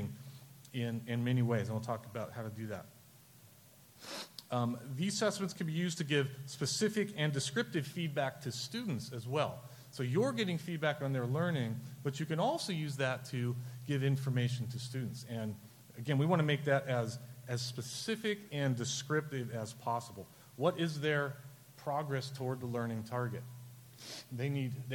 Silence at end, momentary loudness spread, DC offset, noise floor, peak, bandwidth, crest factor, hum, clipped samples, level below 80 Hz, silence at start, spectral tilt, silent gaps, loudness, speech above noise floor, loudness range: 0 s; 13 LU; under 0.1%; -61 dBFS; -16 dBFS; 17.5 kHz; 20 dB; none; under 0.1%; -76 dBFS; 0 s; -5.5 dB/octave; none; -37 LUFS; 25 dB; 4 LU